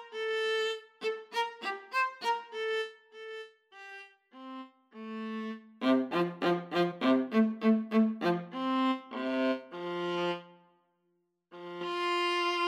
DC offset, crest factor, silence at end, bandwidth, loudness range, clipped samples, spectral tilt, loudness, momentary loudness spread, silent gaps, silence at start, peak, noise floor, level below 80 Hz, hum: under 0.1%; 18 dB; 0 s; 13 kHz; 8 LU; under 0.1%; -5.5 dB/octave; -32 LUFS; 19 LU; none; 0 s; -16 dBFS; -77 dBFS; -88 dBFS; none